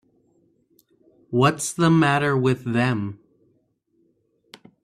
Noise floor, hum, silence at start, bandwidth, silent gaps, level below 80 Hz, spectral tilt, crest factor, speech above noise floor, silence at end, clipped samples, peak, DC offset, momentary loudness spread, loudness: -67 dBFS; none; 1.3 s; 14 kHz; none; -60 dBFS; -5.5 dB/octave; 20 dB; 47 dB; 1.7 s; under 0.1%; -4 dBFS; under 0.1%; 10 LU; -21 LUFS